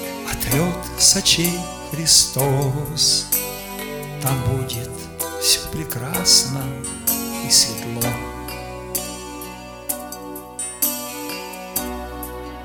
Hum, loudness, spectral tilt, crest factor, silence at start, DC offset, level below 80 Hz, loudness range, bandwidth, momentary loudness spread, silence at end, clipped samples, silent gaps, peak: none; -19 LUFS; -2.5 dB/octave; 22 dB; 0 s; under 0.1%; -40 dBFS; 10 LU; 19 kHz; 18 LU; 0 s; under 0.1%; none; 0 dBFS